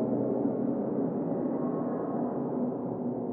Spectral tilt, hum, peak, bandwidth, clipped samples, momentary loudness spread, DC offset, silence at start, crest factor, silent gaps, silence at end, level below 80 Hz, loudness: -14 dB/octave; none; -16 dBFS; 2.5 kHz; under 0.1%; 3 LU; under 0.1%; 0 s; 14 dB; none; 0 s; -72 dBFS; -31 LUFS